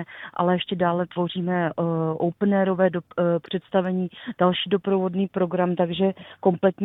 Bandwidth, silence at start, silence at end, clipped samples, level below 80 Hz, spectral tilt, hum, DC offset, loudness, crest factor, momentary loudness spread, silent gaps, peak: 4 kHz; 0 s; 0 s; under 0.1%; -64 dBFS; -10 dB/octave; none; under 0.1%; -24 LUFS; 18 dB; 5 LU; none; -4 dBFS